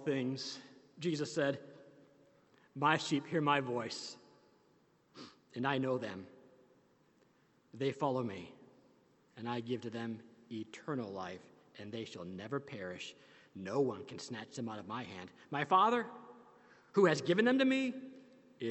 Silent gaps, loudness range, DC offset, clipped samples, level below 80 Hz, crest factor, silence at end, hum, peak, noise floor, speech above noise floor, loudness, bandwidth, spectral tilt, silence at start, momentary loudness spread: none; 11 LU; under 0.1%; under 0.1%; -82 dBFS; 24 dB; 0 s; none; -14 dBFS; -71 dBFS; 35 dB; -36 LUFS; 8.4 kHz; -5.5 dB/octave; 0 s; 20 LU